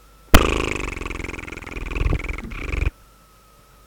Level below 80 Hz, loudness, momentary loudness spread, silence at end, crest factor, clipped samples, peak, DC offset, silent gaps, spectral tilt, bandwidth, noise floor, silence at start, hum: -26 dBFS; -24 LUFS; 15 LU; 0.95 s; 22 dB; under 0.1%; 0 dBFS; under 0.1%; none; -4.5 dB/octave; over 20 kHz; -51 dBFS; 0.3 s; none